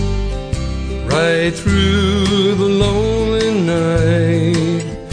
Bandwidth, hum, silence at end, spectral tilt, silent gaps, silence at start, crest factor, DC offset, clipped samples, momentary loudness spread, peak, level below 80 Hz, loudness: 10.5 kHz; none; 0 s; -6 dB/octave; none; 0 s; 12 dB; under 0.1%; under 0.1%; 8 LU; -2 dBFS; -26 dBFS; -15 LUFS